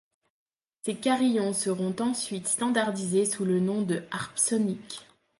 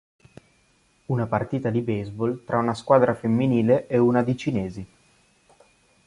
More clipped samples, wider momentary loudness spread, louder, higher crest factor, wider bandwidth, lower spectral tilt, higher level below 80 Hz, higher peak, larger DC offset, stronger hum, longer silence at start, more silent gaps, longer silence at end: neither; about the same, 9 LU vs 10 LU; second, -27 LUFS vs -23 LUFS; about the same, 18 dB vs 20 dB; about the same, 11.5 kHz vs 11 kHz; second, -4 dB/octave vs -8.5 dB/octave; second, -72 dBFS vs -56 dBFS; second, -10 dBFS vs -4 dBFS; neither; neither; second, 0.85 s vs 1.1 s; neither; second, 0.35 s vs 1.2 s